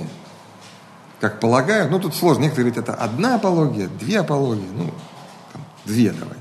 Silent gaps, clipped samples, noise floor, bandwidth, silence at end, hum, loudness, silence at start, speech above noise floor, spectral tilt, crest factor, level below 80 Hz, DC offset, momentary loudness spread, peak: none; under 0.1%; -44 dBFS; 13 kHz; 0 s; none; -20 LUFS; 0 s; 25 dB; -6 dB/octave; 18 dB; -64 dBFS; under 0.1%; 21 LU; -2 dBFS